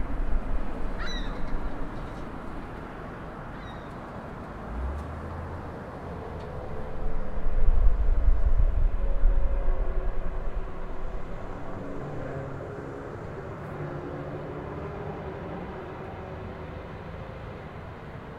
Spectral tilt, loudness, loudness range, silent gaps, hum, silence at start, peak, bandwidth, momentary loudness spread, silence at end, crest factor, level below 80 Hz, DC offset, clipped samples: -7.5 dB/octave; -35 LUFS; 8 LU; none; none; 0 s; -6 dBFS; 4.6 kHz; 11 LU; 0 s; 20 dB; -28 dBFS; under 0.1%; under 0.1%